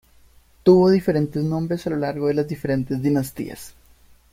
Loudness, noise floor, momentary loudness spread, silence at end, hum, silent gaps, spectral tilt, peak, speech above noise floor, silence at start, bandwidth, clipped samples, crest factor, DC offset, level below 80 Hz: -21 LUFS; -53 dBFS; 14 LU; 0.6 s; none; none; -7.5 dB/octave; -4 dBFS; 33 dB; 0.65 s; 16 kHz; under 0.1%; 18 dB; under 0.1%; -52 dBFS